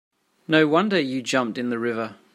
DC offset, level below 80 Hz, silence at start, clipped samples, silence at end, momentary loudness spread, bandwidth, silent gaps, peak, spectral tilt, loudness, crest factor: under 0.1%; -70 dBFS; 0.5 s; under 0.1%; 0.2 s; 8 LU; 13 kHz; none; -2 dBFS; -5 dB/octave; -22 LUFS; 20 dB